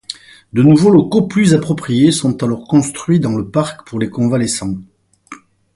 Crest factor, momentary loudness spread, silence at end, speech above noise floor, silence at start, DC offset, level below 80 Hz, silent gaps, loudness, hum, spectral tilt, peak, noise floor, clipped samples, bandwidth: 14 dB; 12 LU; 0.4 s; 26 dB; 0.1 s; under 0.1%; -48 dBFS; none; -14 LUFS; none; -6 dB/octave; 0 dBFS; -39 dBFS; under 0.1%; 11.5 kHz